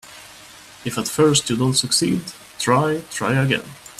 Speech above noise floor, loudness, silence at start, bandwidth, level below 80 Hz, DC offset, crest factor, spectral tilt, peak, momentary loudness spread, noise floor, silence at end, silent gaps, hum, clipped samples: 24 dB; -19 LUFS; 0.05 s; 15.5 kHz; -54 dBFS; under 0.1%; 18 dB; -4 dB/octave; -4 dBFS; 18 LU; -43 dBFS; 0.1 s; none; none; under 0.1%